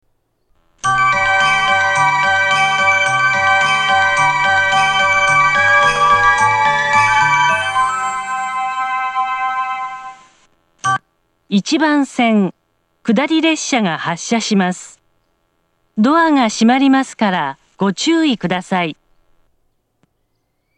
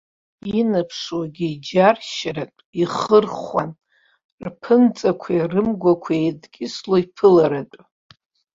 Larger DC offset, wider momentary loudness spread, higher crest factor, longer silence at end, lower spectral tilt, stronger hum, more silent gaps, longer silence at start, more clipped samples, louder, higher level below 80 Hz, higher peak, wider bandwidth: neither; second, 9 LU vs 15 LU; about the same, 14 dB vs 18 dB; first, 1.85 s vs 0.8 s; second, -3.5 dB/octave vs -6.5 dB/octave; neither; second, none vs 2.65-2.73 s, 4.24-4.38 s; first, 0.85 s vs 0.45 s; neither; first, -14 LUFS vs -19 LUFS; first, -48 dBFS vs -58 dBFS; about the same, 0 dBFS vs -2 dBFS; first, 10.5 kHz vs 7.8 kHz